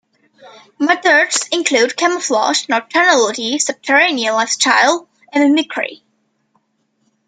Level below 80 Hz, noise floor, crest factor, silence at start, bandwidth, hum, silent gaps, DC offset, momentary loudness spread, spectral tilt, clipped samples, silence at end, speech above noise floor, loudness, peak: -70 dBFS; -65 dBFS; 16 dB; 0.45 s; 9.6 kHz; none; none; under 0.1%; 8 LU; -0.5 dB/octave; under 0.1%; 1.35 s; 50 dB; -14 LUFS; 0 dBFS